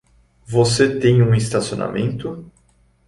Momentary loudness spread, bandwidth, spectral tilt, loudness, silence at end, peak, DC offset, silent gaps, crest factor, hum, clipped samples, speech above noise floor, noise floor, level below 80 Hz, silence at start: 14 LU; 11.5 kHz; -6 dB/octave; -18 LUFS; 0.6 s; -2 dBFS; under 0.1%; none; 16 dB; none; under 0.1%; 40 dB; -57 dBFS; -46 dBFS; 0.5 s